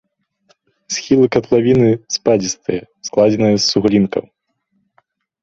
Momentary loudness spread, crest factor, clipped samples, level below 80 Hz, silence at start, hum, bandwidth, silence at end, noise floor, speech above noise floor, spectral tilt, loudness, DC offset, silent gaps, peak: 11 LU; 16 dB; under 0.1%; -50 dBFS; 0.9 s; none; 7.8 kHz; 1.2 s; -66 dBFS; 52 dB; -5 dB/octave; -15 LUFS; under 0.1%; none; 0 dBFS